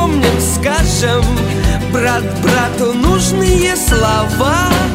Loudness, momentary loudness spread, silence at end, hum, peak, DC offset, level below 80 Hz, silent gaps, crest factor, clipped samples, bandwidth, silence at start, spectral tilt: -13 LUFS; 3 LU; 0 s; none; 0 dBFS; 0.1%; -20 dBFS; none; 12 dB; under 0.1%; 16.5 kHz; 0 s; -4.5 dB/octave